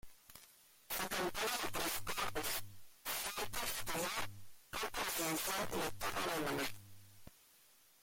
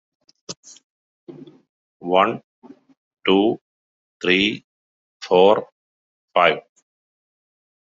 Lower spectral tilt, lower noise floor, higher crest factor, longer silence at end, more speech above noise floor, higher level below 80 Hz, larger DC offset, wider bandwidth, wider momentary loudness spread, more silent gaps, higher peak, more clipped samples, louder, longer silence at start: about the same, -2 dB/octave vs -2.5 dB/octave; second, -67 dBFS vs under -90 dBFS; second, 14 dB vs 22 dB; second, 0.7 s vs 1.2 s; second, 28 dB vs over 72 dB; about the same, -62 dBFS vs -64 dBFS; neither; first, 17 kHz vs 7.8 kHz; about the same, 20 LU vs 21 LU; second, none vs 0.57-0.63 s, 0.84-1.27 s, 1.69-2.00 s, 2.44-2.62 s, 2.97-3.11 s, 3.61-4.20 s, 4.64-5.20 s, 5.72-6.28 s; second, -26 dBFS vs -2 dBFS; neither; second, -39 LUFS vs -19 LUFS; second, 0.05 s vs 0.5 s